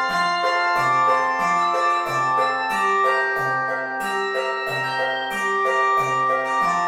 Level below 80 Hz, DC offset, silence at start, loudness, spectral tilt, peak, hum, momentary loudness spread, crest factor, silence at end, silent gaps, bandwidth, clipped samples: -58 dBFS; under 0.1%; 0 s; -20 LUFS; -3.5 dB/octave; -8 dBFS; none; 5 LU; 12 dB; 0 s; none; 16.5 kHz; under 0.1%